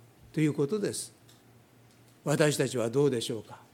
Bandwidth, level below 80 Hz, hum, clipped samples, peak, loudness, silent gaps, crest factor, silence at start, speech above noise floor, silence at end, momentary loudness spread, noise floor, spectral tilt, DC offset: 16.5 kHz; -72 dBFS; none; under 0.1%; -8 dBFS; -30 LUFS; none; 24 dB; 0.35 s; 30 dB; 0.15 s; 12 LU; -59 dBFS; -5 dB/octave; under 0.1%